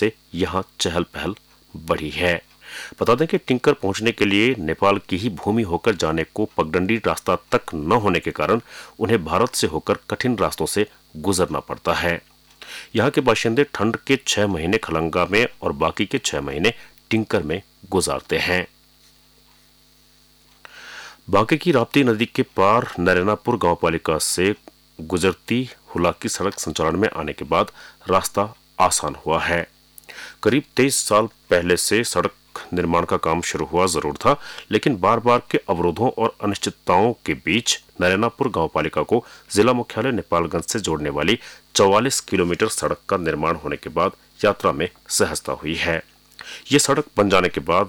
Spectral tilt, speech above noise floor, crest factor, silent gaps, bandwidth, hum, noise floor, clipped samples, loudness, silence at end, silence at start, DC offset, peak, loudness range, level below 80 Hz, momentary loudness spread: -4 dB/octave; 34 dB; 16 dB; none; over 20 kHz; none; -55 dBFS; under 0.1%; -21 LUFS; 0 s; 0 s; under 0.1%; -6 dBFS; 3 LU; -46 dBFS; 8 LU